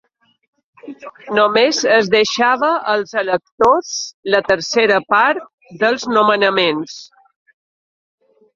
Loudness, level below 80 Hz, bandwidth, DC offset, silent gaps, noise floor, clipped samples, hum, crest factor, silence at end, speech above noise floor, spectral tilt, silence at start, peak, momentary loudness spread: -15 LUFS; -58 dBFS; 7.6 kHz; under 0.1%; 3.52-3.58 s, 4.14-4.23 s, 5.54-5.58 s; under -90 dBFS; under 0.1%; none; 16 dB; 1.5 s; over 74 dB; -3 dB/octave; 0.85 s; 0 dBFS; 12 LU